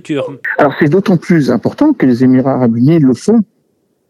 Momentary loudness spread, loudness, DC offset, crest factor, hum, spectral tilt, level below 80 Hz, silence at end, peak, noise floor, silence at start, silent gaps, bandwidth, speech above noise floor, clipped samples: 7 LU; -11 LUFS; under 0.1%; 10 dB; none; -8 dB/octave; -54 dBFS; 0.65 s; 0 dBFS; -60 dBFS; 0.05 s; none; 11.5 kHz; 50 dB; under 0.1%